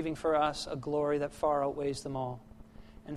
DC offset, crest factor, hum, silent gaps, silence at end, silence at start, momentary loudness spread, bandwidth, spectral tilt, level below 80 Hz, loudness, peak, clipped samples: under 0.1%; 16 dB; none; none; 0 s; 0 s; 10 LU; 13 kHz; -5.5 dB/octave; -56 dBFS; -33 LUFS; -16 dBFS; under 0.1%